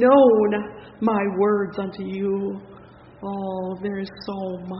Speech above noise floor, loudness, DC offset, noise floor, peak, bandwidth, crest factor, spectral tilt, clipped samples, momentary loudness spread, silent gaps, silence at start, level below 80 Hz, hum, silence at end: 25 dB; -23 LUFS; under 0.1%; -46 dBFS; -4 dBFS; 5.8 kHz; 18 dB; -6 dB/octave; under 0.1%; 15 LU; none; 0 s; -58 dBFS; none; 0 s